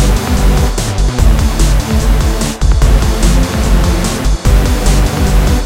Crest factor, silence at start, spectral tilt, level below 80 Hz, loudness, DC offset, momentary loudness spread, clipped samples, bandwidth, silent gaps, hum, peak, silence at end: 10 dB; 0 s; -5 dB/octave; -10 dBFS; -12 LUFS; under 0.1%; 3 LU; under 0.1%; 16.5 kHz; none; none; 0 dBFS; 0 s